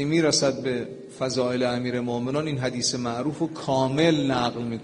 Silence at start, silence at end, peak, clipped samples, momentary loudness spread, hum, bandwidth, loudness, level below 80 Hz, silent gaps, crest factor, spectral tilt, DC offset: 0 s; 0 s; -6 dBFS; under 0.1%; 8 LU; none; 11 kHz; -25 LUFS; -58 dBFS; none; 18 dB; -4.5 dB/octave; under 0.1%